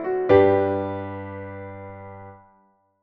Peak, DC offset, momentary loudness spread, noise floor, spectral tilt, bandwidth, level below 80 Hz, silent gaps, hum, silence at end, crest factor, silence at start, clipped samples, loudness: -4 dBFS; under 0.1%; 24 LU; -62 dBFS; -6.5 dB/octave; 4.8 kHz; -56 dBFS; none; none; 0.65 s; 20 dB; 0 s; under 0.1%; -20 LUFS